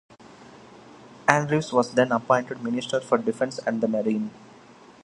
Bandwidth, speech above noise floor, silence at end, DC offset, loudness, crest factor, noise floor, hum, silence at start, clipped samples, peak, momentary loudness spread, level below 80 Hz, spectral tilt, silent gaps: 11.5 kHz; 26 dB; 0.6 s; under 0.1%; -24 LUFS; 26 dB; -50 dBFS; none; 0.25 s; under 0.1%; 0 dBFS; 7 LU; -66 dBFS; -5.5 dB/octave; none